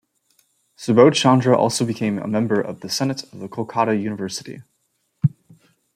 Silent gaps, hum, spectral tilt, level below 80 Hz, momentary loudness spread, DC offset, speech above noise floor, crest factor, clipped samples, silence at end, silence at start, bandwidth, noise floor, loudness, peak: none; none; -5.5 dB/octave; -64 dBFS; 17 LU; under 0.1%; 51 dB; 20 dB; under 0.1%; 0.65 s; 0.8 s; 16 kHz; -70 dBFS; -19 LUFS; -2 dBFS